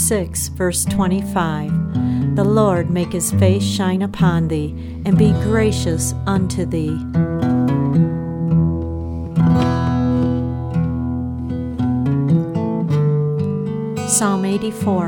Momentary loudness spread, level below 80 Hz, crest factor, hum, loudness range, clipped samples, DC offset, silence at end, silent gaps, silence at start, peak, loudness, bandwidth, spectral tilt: 7 LU; -34 dBFS; 16 dB; none; 2 LU; under 0.1%; under 0.1%; 0 s; none; 0 s; -2 dBFS; -18 LUFS; 17.5 kHz; -6 dB/octave